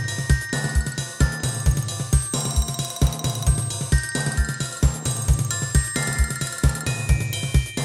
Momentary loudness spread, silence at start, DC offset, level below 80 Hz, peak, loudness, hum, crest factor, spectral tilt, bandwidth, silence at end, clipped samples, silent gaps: 3 LU; 0 s; under 0.1%; -26 dBFS; -4 dBFS; -23 LUFS; none; 18 dB; -4 dB/octave; 16 kHz; 0 s; under 0.1%; none